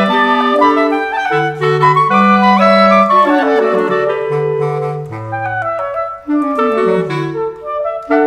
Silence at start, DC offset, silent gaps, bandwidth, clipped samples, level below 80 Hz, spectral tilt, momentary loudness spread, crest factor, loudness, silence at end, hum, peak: 0 s; under 0.1%; none; 12 kHz; under 0.1%; -50 dBFS; -7 dB/octave; 11 LU; 12 dB; -13 LUFS; 0 s; none; 0 dBFS